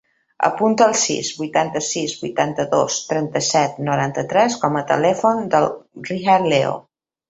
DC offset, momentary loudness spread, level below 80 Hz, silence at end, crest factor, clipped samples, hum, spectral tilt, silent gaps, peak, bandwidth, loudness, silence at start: under 0.1%; 8 LU; -60 dBFS; 0.5 s; 18 dB; under 0.1%; none; -4 dB/octave; none; -2 dBFS; 8.2 kHz; -19 LUFS; 0.4 s